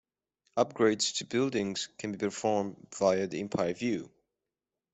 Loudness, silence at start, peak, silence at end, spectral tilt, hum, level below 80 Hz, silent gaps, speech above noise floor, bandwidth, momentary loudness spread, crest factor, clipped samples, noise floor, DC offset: -31 LUFS; 0.55 s; -12 dBFS; 0.85 s; -4 dB/octave; none; -70 dBFS; none; 59 dB; 8.2 kHz; 9 LU; 20 dB; under 0.1%; -89 dBFS; under 0.1%